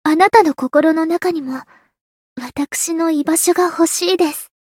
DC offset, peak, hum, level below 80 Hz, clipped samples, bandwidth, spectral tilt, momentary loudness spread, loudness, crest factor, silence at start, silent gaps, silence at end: under 0.1%; 0 dBFS; none; -60 dBFS; under 0.1%; 17 kHz; -2 dB/octave; 14 LU; -15 LUFS; 16 dB; 0.05 s; 2.01-2.36 s; 0.15 s